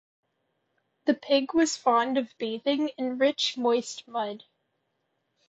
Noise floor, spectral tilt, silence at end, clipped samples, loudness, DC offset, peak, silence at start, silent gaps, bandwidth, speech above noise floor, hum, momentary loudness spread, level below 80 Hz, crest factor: -77 dBFS; -2.5 dB/octave; 1.15 s; under 0.1%; -27 LUFS; under 0.1%; -10 dBFS; 1.05 s; none; 8.6 kHz; 51 dB; none; 9 LU; -72 dBFS; 18 dB